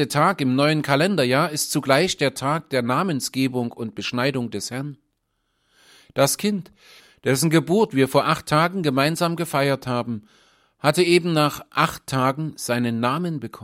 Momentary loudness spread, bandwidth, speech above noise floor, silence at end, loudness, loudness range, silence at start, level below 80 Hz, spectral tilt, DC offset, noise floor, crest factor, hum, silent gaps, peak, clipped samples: 10 LU; 16.5 kHz; 51 dB; 0 s; -21 LUFS; 5 LU; 0 s; -60 dBFS; -5 dB/octave; under 0.1%; -72 dBFS; 20 dB; none; none; -2 dBFS; under 0.1%